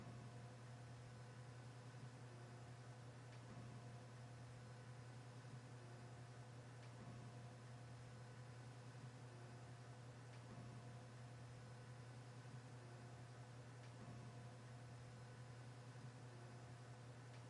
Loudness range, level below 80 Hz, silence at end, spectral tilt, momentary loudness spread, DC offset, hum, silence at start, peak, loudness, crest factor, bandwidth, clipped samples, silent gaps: 0 LU; -80 dBFS; 0 s; -6 dB/octave; 2 LU; under 0.1%; none; 0 s; -46 dBFS; -59 LUFS; 12 dB; 11 kHz; under 0.1%; none